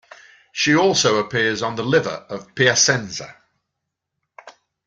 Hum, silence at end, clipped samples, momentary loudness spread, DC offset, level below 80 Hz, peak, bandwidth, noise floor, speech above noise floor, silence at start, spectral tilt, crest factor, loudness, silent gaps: none; 0.35 s; under 0.1%; 17 LU; under 0.1%; -60 dBFS; -2 dBFS; 10 kHz; -80 dBFS; 61 dB; 0.55 s; -3 dB/octave; 20 dB; -18 LUFS; none